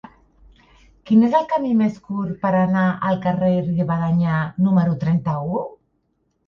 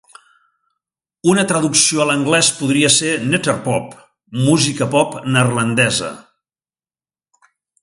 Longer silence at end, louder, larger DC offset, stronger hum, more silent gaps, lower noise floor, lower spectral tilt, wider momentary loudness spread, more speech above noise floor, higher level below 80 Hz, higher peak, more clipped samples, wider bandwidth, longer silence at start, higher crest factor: second, 0.75 s vs 1.6 s; second, -20 LUFS vs -15 LUFS; neither; neither; neither; second, -68 dBFS vs under -90 dBFS; first, -9.5 dB/octave vs -3.5 dB/octave; about the same, 8 LU vs 8 LU; second, 50 dB vs over 74 dB; about the same, -52 dBFS vs -56 dBFS; second, -4 dBFS vs 0 dBFS; neither; second, 6.2 kHz vs 11.5 kHz; second, 1.05 s vs 1.25 s; about the same, 16 dB vs 18 dB